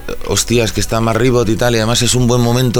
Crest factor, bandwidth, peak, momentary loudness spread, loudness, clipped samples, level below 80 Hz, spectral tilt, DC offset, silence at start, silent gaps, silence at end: 12 dB; over 20 kHz; 0 dBFS; 4 LU; -13 LUFS; under 0.1%; -28 dBFS; -4.5 dB/octave; under 0.1%; 0 s; none; 0 s